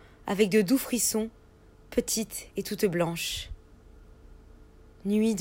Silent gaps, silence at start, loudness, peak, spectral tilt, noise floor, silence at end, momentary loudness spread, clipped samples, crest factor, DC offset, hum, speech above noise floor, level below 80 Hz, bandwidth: none; 0.25 s; -28 LUFS; -10 dBFS; -4 dB/octave; -55 dBFS; 0 s; 13 LU; under 0.1%; 20 dB; under 0.1%; none; 28 dB; -52 dBFS; 16.5 kHz